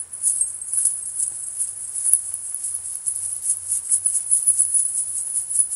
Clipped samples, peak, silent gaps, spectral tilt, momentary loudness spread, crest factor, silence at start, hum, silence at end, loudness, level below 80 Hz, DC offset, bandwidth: under 0.1%; 0 dBFS; none; 2 dB/octave; 9 LU; 24 dB; 0 s; none; 0 s; -20 LUFS; -66 dBFS; under 0.1%; 16 kHz